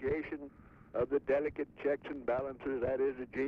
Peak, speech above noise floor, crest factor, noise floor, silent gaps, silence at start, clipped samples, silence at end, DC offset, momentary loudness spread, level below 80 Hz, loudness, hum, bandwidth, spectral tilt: -22 dBFS; 19 dB; 14 dB; -55 dBFS; none; 0 s; under 0.1%; 0 s; under 0.1%; 10 LU; -60 dBFS; -36 LUFS; none; 5 kHz; -8.5 dB/octave